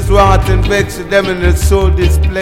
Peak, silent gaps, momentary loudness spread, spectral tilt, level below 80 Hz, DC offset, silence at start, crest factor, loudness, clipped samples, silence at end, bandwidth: 0 dBFS; none; 4 LU; -6 dB/octave; -14 dBFS; under 0.1%; 0 s; 10 dB; -11 LUFS; 0.3%; 0 s; 16 kHz